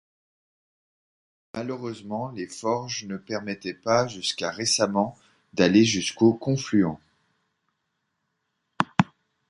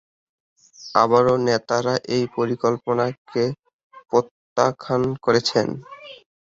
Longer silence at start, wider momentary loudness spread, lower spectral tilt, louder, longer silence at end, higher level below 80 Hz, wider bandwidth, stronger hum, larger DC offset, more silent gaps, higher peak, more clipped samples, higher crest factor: first, 1.55 s vs 0.8 s; second, 13 LU vs 16 LU; about the same, -4.5 dB/octave vs -5.5 dB/octave; second, -25 LUFS vs -21 LUFS; about the same, 0.45 s vs 0.35 s; about the same, -62 dBFS vs -60 dBFS; first, 11.5 kHz vs 7.8 kHz; neither; neither; second, none vs 3.18-3.25 s, 3.73-3.90 s, 4.31-4.56 s; about the same, -2 dBFS vs -2 dBFS; neither; about the same, 24 dB vs 20 dB